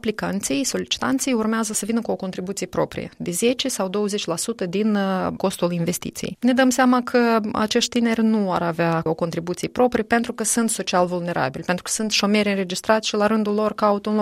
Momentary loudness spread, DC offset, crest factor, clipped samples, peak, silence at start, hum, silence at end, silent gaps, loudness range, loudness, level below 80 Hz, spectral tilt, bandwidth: 7 LU; under 0.1%; 18 dB; under 0.1%; -4 dBFS; 0.05 s; none; 0 s; none; 4 LU; -21 LUFS; -54 dBFS; -4 dB/octave; 16 kHz